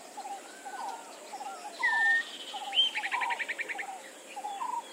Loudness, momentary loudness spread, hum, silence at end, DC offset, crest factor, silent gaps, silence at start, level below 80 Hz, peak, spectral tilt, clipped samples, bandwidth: -31 LUFS; 17 LU; none; 0 s; under 0.1%; 18 dB; none; 0 s; under -90 dBFS; -16 dBFS; 1.5 dB/octave; under 0.1%; 16 kHz